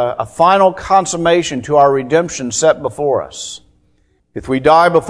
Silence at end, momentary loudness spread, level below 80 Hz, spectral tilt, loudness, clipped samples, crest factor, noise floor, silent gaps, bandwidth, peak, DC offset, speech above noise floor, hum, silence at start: 0 s; 16 LU; -46 dBFS; -4 dB/octave; -13 LUFS; 0.1%; 14 dB; -57 dBFS; none; 11 kHz; 0 dBFS; under 0.1%; 44 dB; none; 0 s